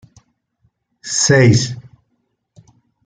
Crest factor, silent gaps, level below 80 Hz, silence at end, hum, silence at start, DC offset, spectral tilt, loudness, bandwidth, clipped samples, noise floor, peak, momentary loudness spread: 18 dB; none; -54 dBFS; 1.25 s; none; 1.05 s; under 0.1%; -4.5 dB/octave; -13 LUFS; 9.6 kHz; under 0.1%; -68 dBFS; -2 dBFS; 23 LU